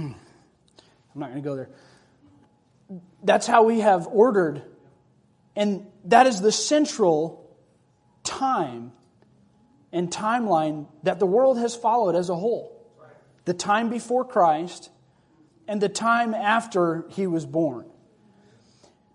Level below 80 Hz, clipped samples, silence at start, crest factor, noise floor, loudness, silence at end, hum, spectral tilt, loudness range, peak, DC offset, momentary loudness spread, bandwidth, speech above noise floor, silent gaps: -72 dBFS; under 0.1%; 0 s; 22 dB; -62 dBFS; -23 LUFS; 1.3 s; none; -4.5 dB/octave; 6 LU; -2 dBFS; under 0.1%; 17 LU; 11 kHz; 40 dB; none